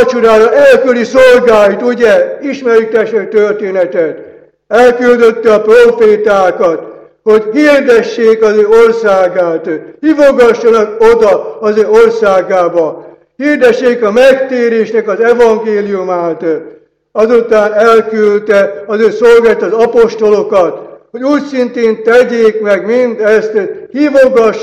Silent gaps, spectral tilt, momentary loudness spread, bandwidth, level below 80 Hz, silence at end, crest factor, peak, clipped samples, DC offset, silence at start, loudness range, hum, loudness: none; -5 dB/octave; 9 LU; 10.5 kHz; -44 dBFS; 0 s; 8 dB; 0 dBFS; 2%; under 0.1%; 0 s; 3 LU; none; -8 LUFS